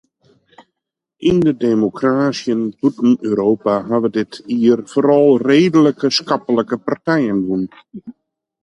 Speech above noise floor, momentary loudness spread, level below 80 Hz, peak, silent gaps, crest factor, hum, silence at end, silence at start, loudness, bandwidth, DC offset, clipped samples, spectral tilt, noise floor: 64 dB; 9 LU; -54 dBFS; -2 dBFS; none; 14 dB; none; 0.55 s; 1.2 s; -16 LUFS; 10.5 kHz; under 0.1%; under 0.1%; -6.5 dB/octave; -79 dBFS